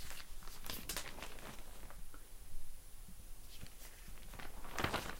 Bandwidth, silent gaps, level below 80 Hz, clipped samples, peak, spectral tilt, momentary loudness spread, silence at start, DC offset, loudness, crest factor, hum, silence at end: 16.5 kHz; none; -50 dBFS; under 0.1%; -20 dBFS; -3 dB/octave; 15 LU; 0 s; under 0.1%; -49 LUFS; 22 dB; none; 0 s